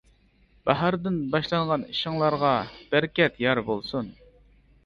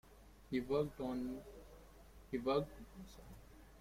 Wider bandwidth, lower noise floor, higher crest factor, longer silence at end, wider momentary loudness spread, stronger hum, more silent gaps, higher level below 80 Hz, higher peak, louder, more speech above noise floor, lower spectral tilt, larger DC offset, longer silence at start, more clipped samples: second, 7.2 kHz vs 16.5 kHz; about the same, -61 dBFS vs -60 dBFS; about the same, 20 dB vs 20 dB; first, 0.75 s vs 0 s; second, 8 LU vs 23 LU; neither; neither; about the same, -56 dBFS vs -60 dBFS; first, -6 dBFS vs -24 dBFS; first, -25 LUFS vs -41 LUFS; first, 36 dB vs 19 dB; about the same, -7.5 dB/octave vs -7 dB/octave; neither; first, 0.65 s vs 0.05 s; neither